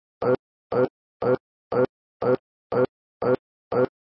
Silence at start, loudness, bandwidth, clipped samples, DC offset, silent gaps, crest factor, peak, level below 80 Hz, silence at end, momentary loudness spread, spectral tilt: 0.2 s; -26 LUFS; 5.6 kHz; under 0.1%; under 0.1%; 0.39-0.70 s, 0.90-1.20 s, 1.40-1.71 s, 1.89-2.20 s, 2.39-2.70 s, 2.89-3.20 s, 3.39-3.71 s; 16 dB; -10 dBFS; -62 dBFS; 0.15 s; 3 LU; -11.5 dB/octave